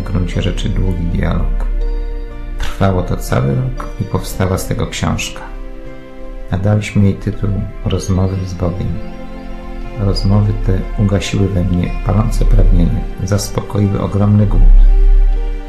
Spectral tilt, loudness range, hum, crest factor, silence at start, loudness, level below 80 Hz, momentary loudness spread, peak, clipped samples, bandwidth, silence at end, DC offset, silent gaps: -6.5 dB/octave; 4 LU; none; 14 dB; 0 s; -16 LUFS; -16 dBFS; 16 LU; 0 dBFS; under 0.1%; 13 kHz; 0 s; under 0.1%; none